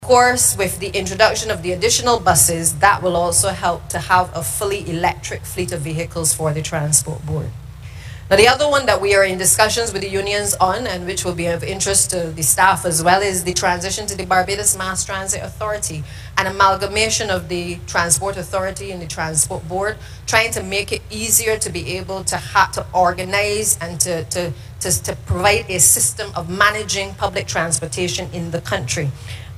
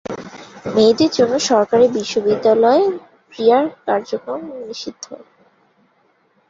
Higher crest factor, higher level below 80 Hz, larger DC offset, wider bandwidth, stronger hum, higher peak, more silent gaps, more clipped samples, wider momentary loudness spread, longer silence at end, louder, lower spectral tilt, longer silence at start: about the same, 18 dB vs 16 dB; first, -38 dBFS vs -60 dBFS; neither; first, 15.5 kHz vs 7.8 kHz; neither; about the same, 0 dBFS vs -2 dBFS; neither; neither; second, 12 LU vs 18 LU; second, 0 s vs 1.3 s; about the same, -17 LUFS vs -16 LUFS; second, -2.5 dB/octave vs -4.5 dB/octave; about the same, 0 s vs 0.1 s